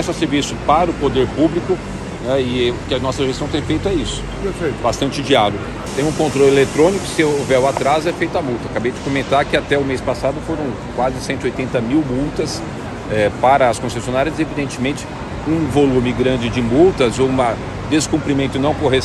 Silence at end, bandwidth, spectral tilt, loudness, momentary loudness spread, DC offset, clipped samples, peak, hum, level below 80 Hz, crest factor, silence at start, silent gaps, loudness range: 0 s; 12.5 kHz; -5.5 dB/octave; -17 LUFS; 9 LU; under 0.1%; under 0.1%; 0 dBFS; none; -34 dBFS; 16 dB; 0 s; none; 3 LU